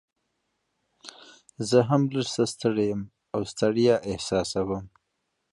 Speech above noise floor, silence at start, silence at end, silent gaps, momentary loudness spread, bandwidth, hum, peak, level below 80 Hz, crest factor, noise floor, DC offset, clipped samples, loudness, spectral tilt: 53 dB; 1.05 s; 0.65 s; none; 15 LU; 11.5 kHz; none; -8 dBFS; -56 dBFS; 20 dB; -78 dBFS; under 0.1%; under 0.1%; -26 LUFS; -5.5 dB/octave